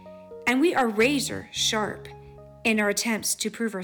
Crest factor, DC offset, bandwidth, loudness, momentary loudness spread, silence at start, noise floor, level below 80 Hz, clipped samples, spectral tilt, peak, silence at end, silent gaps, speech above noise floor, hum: 14 dB; under 0.1%; 19 kHz; -24 LUFS; 10 LU; 0 s; -46 dBFS; -56 dBFS; under 0.1%; -2.5 dB/octave; -12 dBFS; 0 s; none; 21 dB; none